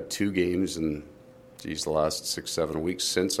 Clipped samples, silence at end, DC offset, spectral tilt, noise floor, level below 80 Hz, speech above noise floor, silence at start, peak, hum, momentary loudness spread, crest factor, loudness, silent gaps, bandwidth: under 0.1%; 0 s; under 0.1%; -3.5 dB/octave; -50 dBFS; -52 dBFS; 22 dB; 0 s; -10 dBFS; none; 8 LU; 20 dB; -28 LUFS; none; 16 kHz